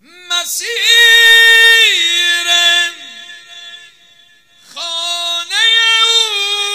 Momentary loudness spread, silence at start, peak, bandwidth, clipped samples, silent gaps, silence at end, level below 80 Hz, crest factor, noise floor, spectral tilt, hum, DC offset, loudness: 14 LU; 0.3 s; 0 dBFS; 16.5 kHz; 0.3%; none; 0 s; -60 dBFS; 12 dB; -47 dBFS; 4 dB/octave; none; under 0.1%; -8 LUFS